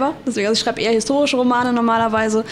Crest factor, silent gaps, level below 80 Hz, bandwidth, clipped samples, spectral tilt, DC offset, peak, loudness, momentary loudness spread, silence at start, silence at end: 12 dB; none; -54 dBFS; 12.5 kHz; under 0.1%; -3.5 dB/octave; under 0.1%; -6 dBFS; -17 LUFS; 2 LU; 0 s; 0 s